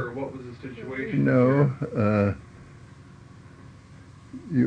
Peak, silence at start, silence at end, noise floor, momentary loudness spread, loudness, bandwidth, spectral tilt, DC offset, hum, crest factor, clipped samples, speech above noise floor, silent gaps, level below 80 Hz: -8 dBFS; 0 s; 0 s; -48 dBFS; 19 LU; -24 LUFS; 8.4 kHz; -9.5 dB/octave; under 0.1%; none; 18 dB; under 0.1%; 24 dB; none; -56 dBFS